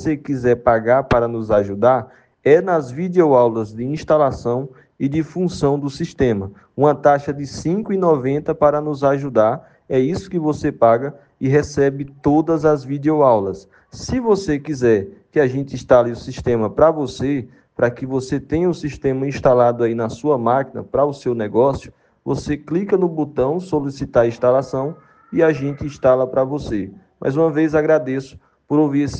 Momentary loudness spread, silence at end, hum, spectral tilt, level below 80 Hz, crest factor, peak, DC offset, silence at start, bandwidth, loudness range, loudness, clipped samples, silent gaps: 10 LU; 0 s; none; -7.5 dB/octave; -46 dBFS; 18 dB; 0 dBFS; under 0.1%; 0 s; 9 kHz; 3 LU; -18 LUFS; under 0.1%; none